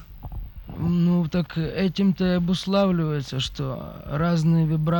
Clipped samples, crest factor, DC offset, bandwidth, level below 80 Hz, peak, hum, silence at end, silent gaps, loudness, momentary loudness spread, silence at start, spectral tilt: under 0.1%; 14 dB; under 0.1%; 18.5 kHz; -42 dBFS; -10 dBFS; none; 0 s; none; -23 LUFS; 16 LU; 0 s; -7.5 dB/octave